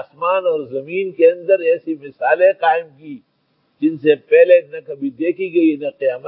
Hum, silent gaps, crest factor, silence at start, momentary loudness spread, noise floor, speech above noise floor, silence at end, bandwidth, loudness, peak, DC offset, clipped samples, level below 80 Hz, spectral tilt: none; none; 16 dB; 0 s; 14 LU; -64 dBFS; 48 dB; 0 s; 4.4 kHz; -16 LUFS; 0 dBFS; under 0.1%; under 0.1%; -78 dBFS; -10.5 dB/octave